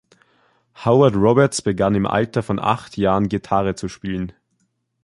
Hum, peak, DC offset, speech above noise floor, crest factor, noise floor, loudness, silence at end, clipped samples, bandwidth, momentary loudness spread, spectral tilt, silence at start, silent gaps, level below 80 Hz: none; -2 dBFS; under 0.1%; 51 dB; 18 dB; -69 dBFS; -19 LUFS; 0.75 s; under 0.1%; 11.5 kHz; 12 LU; -6.5 dB/octave; 0.8 s; none; -46 dBFS